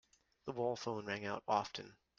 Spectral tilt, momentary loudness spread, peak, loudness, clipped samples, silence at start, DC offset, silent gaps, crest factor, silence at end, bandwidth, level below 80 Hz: -4.5 dB/octave; 11 LU; -18 dBFS; -41 LUFS; under 0.1%; 0.45 s; under 0.1%; none; 24 dB; 0.25 s; 7.6 kHz; -78 dBFS